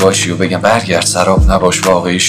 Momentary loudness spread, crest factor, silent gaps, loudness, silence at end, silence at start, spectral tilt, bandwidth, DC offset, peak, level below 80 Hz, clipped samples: 3 LU; 10 dB; none; -11 LUFS; 0 s; 0 s; -4 dB/octave; 16 kHz; under 0.1%; 0 dBFS; -20 dBFS; 0.3%